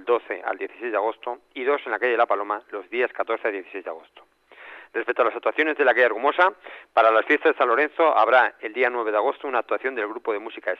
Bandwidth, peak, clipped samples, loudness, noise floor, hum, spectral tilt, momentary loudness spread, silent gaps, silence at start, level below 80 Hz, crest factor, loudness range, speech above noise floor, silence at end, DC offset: 6.4 kHz; -6 dBFS; under 0.1%; -22 LUFS; -45 dBFS; none; -4 dB/octave; 14 LU; none; 0 s; -78 dBFS; 16 dB; 7 LU; 22 dB; 0.05 s; under 0.1%